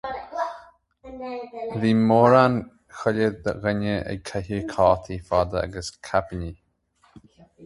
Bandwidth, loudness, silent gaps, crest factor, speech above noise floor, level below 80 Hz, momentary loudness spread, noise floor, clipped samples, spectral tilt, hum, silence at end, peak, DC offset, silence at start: 11.5 kHz; -23 LUFS; none; 22 dB; 41 dB; -46 dBFS; 17 LU; -63 dBFS; under 0.1%; -7 dB/octave; none; 0 s; -2 dBFS; under 0.1%; 0.05 s